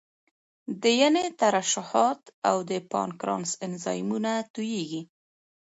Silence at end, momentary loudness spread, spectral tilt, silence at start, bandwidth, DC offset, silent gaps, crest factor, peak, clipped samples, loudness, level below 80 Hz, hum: 0.55 s; 10 LU; -3.5 dB/octave; 0.7 s; 8 kHz; under 0.1%; 2.33-2.42 s, 4.50-4.54 s; 20 dB; -8 dBFS; under 0.1%; -26 LUFS; -76 dBFS; none